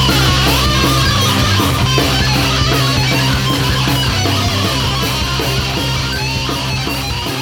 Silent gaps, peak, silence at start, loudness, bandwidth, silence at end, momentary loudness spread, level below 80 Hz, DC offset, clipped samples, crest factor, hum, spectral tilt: none; 0 dBFS; 0 s; -13 LUFS; 19 kHz; 0 s; 5 LU; -24 dBFS; under 0.1%; under 0.1%; 14 dB; none; -4 dB/octave